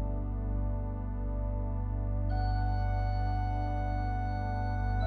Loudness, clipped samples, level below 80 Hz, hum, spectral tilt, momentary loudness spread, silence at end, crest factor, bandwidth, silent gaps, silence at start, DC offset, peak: -34 LUFS; under 0.1%; -34 dBFS; 50 Hz at -40 dBFS; -9.5 dB/octave; 4 LU; 0 s; 12 dB; 4.7 kHz; none; 0 s; under 0.1%; -20 dBFS